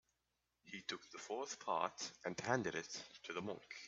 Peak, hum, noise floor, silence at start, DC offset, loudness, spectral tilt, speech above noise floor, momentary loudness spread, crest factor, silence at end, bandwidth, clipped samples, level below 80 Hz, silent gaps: -20 dBFS; none; -87 dBFS; 0.65 s; under 0.1%; -44 LUFS; -3.5 dB/octave; 43 dB; 10 LU; 24 dB; 0 s; 8.2 kHz; under 0.1%; -82 dBFS; none